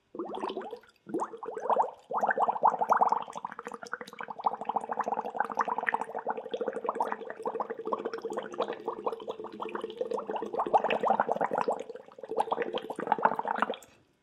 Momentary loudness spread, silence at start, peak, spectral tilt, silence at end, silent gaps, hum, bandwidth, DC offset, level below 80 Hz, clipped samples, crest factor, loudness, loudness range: 13 LU; 0.15 s; -8 dBFS; -4.5 dB/octave; 0.35 s; none; none; 13 kHz; under 0.1%; -80 dBFS; under 0.1%; 24 dB; -32 LUFS; 5 LU